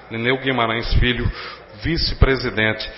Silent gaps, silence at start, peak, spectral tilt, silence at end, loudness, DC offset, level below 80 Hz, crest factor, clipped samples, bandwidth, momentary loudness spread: none; 0 s; 0 dBFS; -9 dB/octave; 0 s; -20 LUFS; under 0.1%; -24 dBFS; 20 dB; under 0.1%; 5.8 kHz; 9 LU